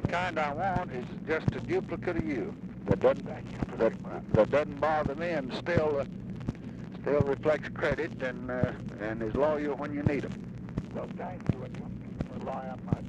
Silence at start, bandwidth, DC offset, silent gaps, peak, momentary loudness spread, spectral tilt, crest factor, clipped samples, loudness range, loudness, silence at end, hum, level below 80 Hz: 0 s; 9.8 kHz; under 0.1%; none; -10 dBFS; 11 LU; -8 dB/octave; 20 dB; under 0.1%; 3 LU; -32 LUFS; 0 s; none; -50 dBFS